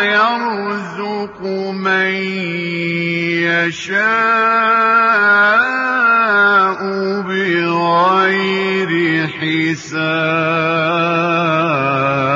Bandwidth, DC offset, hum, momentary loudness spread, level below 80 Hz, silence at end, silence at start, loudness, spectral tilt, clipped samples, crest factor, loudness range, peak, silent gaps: 7.8 kHz; under 0.1%; none; 9 LU; -62 dBFS; 0 s; 0 s; -14 LUFS; -5.5 dB/octave; under 0.1%; 12 dB; 5 LU; -2 dBFS; none